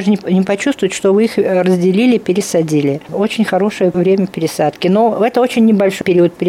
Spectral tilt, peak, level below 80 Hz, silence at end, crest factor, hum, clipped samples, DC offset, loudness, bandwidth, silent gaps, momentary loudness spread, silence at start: -6 dB/octave; -2 dBFS; -56 dBFS; 0 s; 10 dB; none; under 0.1%; under 0.1%; -13 LUFS; 15.5 kHz; none; 4 LU; 0 s